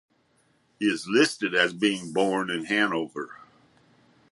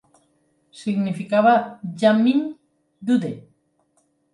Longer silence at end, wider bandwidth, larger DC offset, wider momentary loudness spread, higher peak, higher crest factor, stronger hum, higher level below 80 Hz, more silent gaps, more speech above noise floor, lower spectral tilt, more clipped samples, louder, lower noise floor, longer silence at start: about the same, 0.95 s vs 0.95 s; about the same, 11.5 kHz vs 11 kHz; neither; second, 9 LU vs 16 LU; about the same, -6 dBFS vs -4 dBFS; about the same, 22 dB vs 20 dB; neither; about the same, -72 dBFS vs -72 dBFS; neither; second, 41 dB vs 47 dB; second, -4 dB/octave vs -7 dB/octave; neither; second, -25 LUFS vs -21 LUFS; about the same, -66 dBFS vs -66 dBFS; about the same, 0.8 s vs 0.75 s